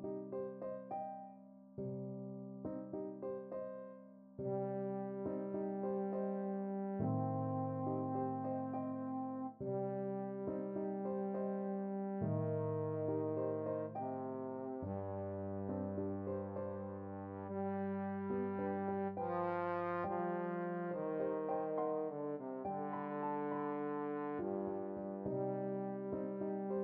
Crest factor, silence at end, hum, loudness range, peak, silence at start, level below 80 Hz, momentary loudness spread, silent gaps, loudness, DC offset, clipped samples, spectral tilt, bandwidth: 16 dB; 0 s; none; 5 LU; -24 dBFS; 0 s; -78 dBFS; 7 LU; none; -41 LUFS; under 0.1%; under 0.1%; -9.5 dB/octave; 3.9 kHz